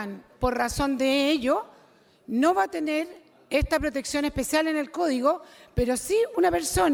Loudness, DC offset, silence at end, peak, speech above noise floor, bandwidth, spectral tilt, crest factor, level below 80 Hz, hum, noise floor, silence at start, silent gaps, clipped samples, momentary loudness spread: -25 LUFS; under 0.1%; 0 s; -10 dBFS; 33 dB; 18 kHz; -4 dB/octave; 16 dB; -42 dBFS; none; -58 dBFS; 0 s; none; under 0.1%; 7 LU